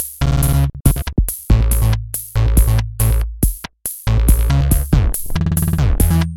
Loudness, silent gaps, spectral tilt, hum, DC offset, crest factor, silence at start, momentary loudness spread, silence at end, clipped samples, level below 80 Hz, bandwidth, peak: -17 LUFS; none; -5.5 dB/octave; none; 0.2%; 14 dB; 0 s; 6 LU; 0 s; under 0.1%; -18 dBFS; 17.5 kHz; 0 dBFS